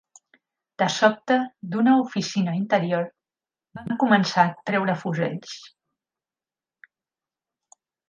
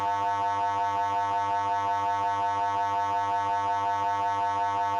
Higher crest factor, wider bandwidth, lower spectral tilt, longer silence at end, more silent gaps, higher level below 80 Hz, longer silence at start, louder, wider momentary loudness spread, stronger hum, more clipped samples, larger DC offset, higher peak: first, 20 dB vs 10 dB; about the same, 9.6 kHz vs 9.6 kHz; first, -5.5 dB/octave vs -4 dB/octave; first, 2.45 s vs 0 s; neither; about the same, -70 dBFS vs -70 dBFS; first, 0.8 s vs 0 s; first, -23 LUFS vs -27 LUFS; first, 13 LU vs 0 LU; neither; neither; neither; first, -4 dBFS vs -18 dBFS